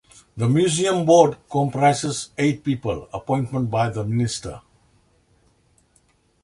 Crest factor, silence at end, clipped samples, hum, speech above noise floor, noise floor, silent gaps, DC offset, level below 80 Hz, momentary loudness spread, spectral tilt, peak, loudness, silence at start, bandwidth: 22 dB; 1.85 s; under 0.1%; none; 41 dB; -62 dBFS; none; under 0.1%; -52 dBFS; 12 LU; -5.5 dB/octave; 0 dBFS; -21 LUFS; 0.35 s; 11.5 kHz